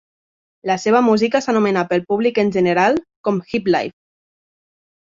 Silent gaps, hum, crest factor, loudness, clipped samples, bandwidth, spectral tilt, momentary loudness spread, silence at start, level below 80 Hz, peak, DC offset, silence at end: 3.16-3.24 s; none; 16 dB; -17 LUFS; under 0.1%; 7.6 kHz; -6 dB/octave; 7 LU; 0.65 s; -58 dBFS; -2 dBFS; under 0.1%; 1.15 s